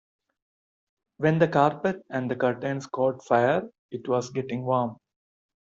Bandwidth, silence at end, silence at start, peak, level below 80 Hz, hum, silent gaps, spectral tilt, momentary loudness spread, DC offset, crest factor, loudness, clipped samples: 7.8 kHz; 0.7 s; 1.2 s; -6 dBFS; -68 dBFS; none; 3.79-3.89 s; -6 dB/octave; 10 LU; under 0.1%; 20 dB; -26 LUFS; under 0.1%